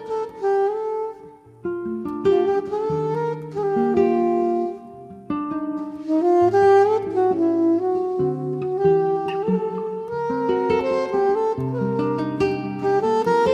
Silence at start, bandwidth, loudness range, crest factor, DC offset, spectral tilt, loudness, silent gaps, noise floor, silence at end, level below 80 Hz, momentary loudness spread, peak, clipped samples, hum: 0 s; 8.4 kHz; 4 LU; 14 dB; under 0.1%; -8 dB/octave; -21 LUFS; none; -44 dBFS; 0 s; -60 dBFS; 10 LU; -6 dBFS; under 0.1%; none